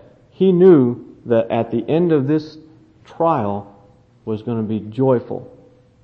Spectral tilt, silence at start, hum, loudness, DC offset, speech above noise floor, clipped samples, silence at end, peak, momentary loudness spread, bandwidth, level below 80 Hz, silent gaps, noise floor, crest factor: -10.5 dB/octave; 0.4 s; none; -17 LUFS; under 0.1%; 33 dB; under 0.1%; 0.55 s; -2 dBFS; 18 LU; 5.6 kHz; -60 dBFS; none; -50 dBFS; 18 dB